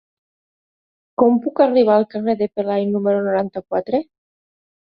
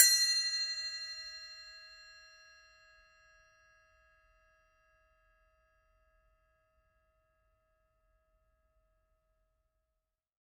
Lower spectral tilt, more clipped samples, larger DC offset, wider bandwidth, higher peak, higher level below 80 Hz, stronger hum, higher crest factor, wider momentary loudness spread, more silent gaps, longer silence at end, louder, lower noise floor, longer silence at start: first, -11 dB/octave vs 6 dB/octave; neither; neither; second, 5.2 kHz vs 15 kHz; first, -2 dBFS vs -6 dBFS; first, -62 dBFS vs -76 dBFS; neither; second, 18 dB vs 34 dB; second, 9 LU vs 27 LU; neither; second, 0.9 s vs 8.5 s; first, -18 LUFS vs -31 LUFS; about the same, under -90 dBFS vs -87 dBFS; first, 1.2 s vs 0 s